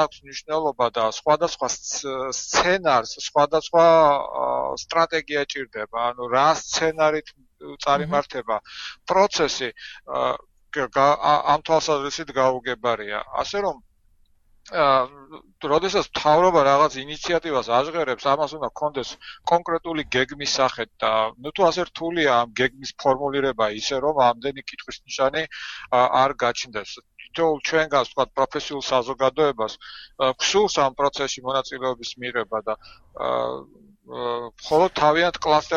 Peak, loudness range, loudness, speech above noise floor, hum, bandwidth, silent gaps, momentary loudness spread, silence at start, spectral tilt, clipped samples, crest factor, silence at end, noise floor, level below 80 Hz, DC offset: -4 dBFS; 4 LU; -22 LUFS; 37 dB; none; 7.6 kHz; none; 12 LU; 0 s; -3 dB/octave; under 0.1%; 18 dB; 0 s; -59 dBFS; -54 dBFS; under 0.1%